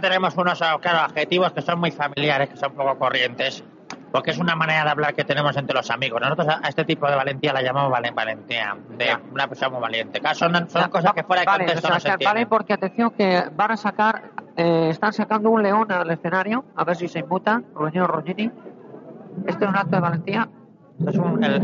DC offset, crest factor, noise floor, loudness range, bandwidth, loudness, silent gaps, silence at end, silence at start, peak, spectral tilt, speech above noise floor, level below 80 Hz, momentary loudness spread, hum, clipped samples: under 0.1%; 16 dB; -41 dBFS; 4 LU; 7.4 kHz; -21 LUFS; none; 0 s; 0 s; -4 dBFS; -3 dB/octave; 19 dB; -68 dBFS; 7 LU; none; under 0.1%